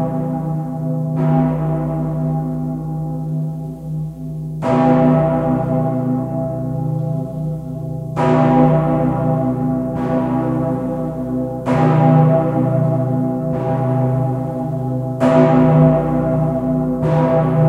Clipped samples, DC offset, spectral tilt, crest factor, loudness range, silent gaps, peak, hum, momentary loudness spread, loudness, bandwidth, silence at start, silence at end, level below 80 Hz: under 0.1%; under 0.1%; -10 dB/octave; 16 dB; 4 LU; none; 0 dBFS; none; 11 LU; -17 LUFS; 4.7 kHz; 0 s; 0 s; -40 dBFS